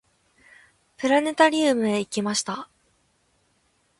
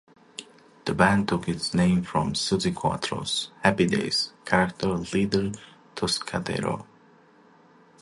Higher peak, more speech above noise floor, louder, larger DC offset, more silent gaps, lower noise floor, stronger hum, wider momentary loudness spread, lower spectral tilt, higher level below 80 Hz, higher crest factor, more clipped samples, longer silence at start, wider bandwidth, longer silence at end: about the same, -4 dBFS vs -6 dBFS; first, 45 dB vs 31 dB; first, -22 LUFS vs -25 LUFS; neither; neither; first, -67 dBFS vs -56 dBFS; neither; about the same, 14 LU vs 13 LU; second, -3.5 dB/octave vs -5 dB/octave; second, -68 dBFS vs -50 dBFS; about the same, 22 dB vs 22 dB; neither; first, 1 s vs 0.4 s; about the same, 11.5 kHz vs 11.5 kHz; first, 1.35 s vs 1.15 s